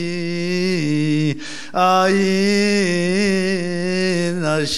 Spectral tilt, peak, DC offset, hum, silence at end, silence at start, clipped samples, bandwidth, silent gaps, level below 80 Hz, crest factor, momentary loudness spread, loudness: -5 dB/octave; -4 dBFS; 2%; none; 0 s; 0 s; under 0.1%; 13.5 kHz; none; -58 dBFS; 14 dB; 7 LU; -18 LUFS